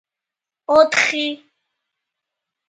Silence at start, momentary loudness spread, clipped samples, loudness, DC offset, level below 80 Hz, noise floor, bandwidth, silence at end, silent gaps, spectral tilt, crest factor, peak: 0.7 s; 22 LU; under 0.1%; -16 LUFS; under 0.1%; -64 dBFS; -87 dBFS; 9.4 kHz; 1.3 s; none; -1.5 dB/octave; 22 dB; 0 dBFS